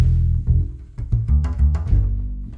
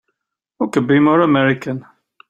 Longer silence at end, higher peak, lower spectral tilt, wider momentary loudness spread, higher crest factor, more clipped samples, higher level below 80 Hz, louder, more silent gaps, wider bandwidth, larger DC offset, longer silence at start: second, 0 s vs 0.5 s; second, -6 dBFS vs -2 dBFS; first, -10 dB/octave vs -7 dB/octave; second, 9 LU vs 13 LU; about the same, 12 dB vs 16 dB; neither; first, -20 dBFS vs -60 dBFS; second, -21 LUFS vs -15 LUFS; neither; second, 2.9 kHz vs 9.8 kHz; neither; second, 0 s vs 0.6 s